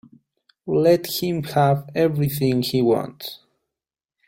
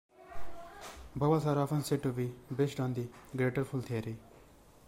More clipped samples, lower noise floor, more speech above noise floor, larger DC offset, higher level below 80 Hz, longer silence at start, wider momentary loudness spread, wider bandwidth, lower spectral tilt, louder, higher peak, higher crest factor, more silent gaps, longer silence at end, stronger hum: neither; first, -88 dBFS vs -59 dBFS; first, 68 dB vs 26 dB; neither; about the same, -58 dBFS vs -58 dBFS; first, 0.65 s vs 0.15 s; second, 14 LU vs 19 LU; about the same, 16.5 kHz vs 16 kHz; about the same, -6.5 dB/octave vs -7 dB/octave; first, -20 LUFS vs -34 LUFS; first, -4 dBFS vs -16 dBFS; about the same, 18 dB vs 18 dB; neither; first, 0.9 s vs 0 s; neither